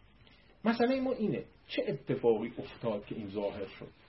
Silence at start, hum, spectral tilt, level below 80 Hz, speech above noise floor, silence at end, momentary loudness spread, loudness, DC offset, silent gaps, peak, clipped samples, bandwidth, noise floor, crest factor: 0.65 s; none; -10 dB/octave; -64 dBFS; 27 dB; 0.15 s; 10 LU; -34 LUFS; under 0.1%; none; -16 dBFS; under 0.1%; 5.8 kHz; -61 dBFS; 18 dB